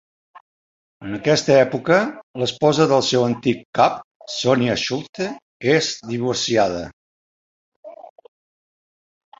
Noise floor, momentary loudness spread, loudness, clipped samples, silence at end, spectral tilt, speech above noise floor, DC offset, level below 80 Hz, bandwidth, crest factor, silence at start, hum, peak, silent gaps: under -90 dBFS; 12 LU; -19 LUFS; under 0.1%; 1.35 s; -4.5 dB/octave; over 71 dB; under 0.1%; -56 dBFS; 8 kHz; 20 dB; 0.35 s; none; -2 dBFS; 0.41-1.00 s, 2.23-2.34 s, 3.65-3.73 s, 4.04-4.20 s, 5.09-5.13 s, 5.42-5.60 s, 6.93-7.83 s